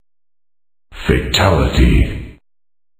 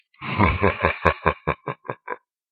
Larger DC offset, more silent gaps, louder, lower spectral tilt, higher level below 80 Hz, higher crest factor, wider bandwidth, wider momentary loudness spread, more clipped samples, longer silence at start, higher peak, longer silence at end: neither; neither; first, -15 LUFS vs -23 LUFS; second, -5.5 dB/octave vs -8 dB/octave; first, -20 dBFS vs -36 dBFS; second, 16 dB vs 24 dB; first, 15.5 kHz vs 7.2 kHz; second, 10 LU vs 15 LU; neither; first, 0.9 s vs 0.2 s; about the same, 0 dBFS vs 0 dBFS; first, 0.65 s vs 0.35 s